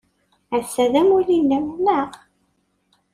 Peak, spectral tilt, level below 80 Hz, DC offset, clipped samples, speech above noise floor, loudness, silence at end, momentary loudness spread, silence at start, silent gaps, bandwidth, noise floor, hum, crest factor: -6 dBFS; -5 dB/octave; -58 dBFS; under 0.1%; under 0.1%; 49 dB; -19 LUFS; 1 s; 10 LU; 0.5 s; none; 15 kHz; -67 dBFS; none; 16 dB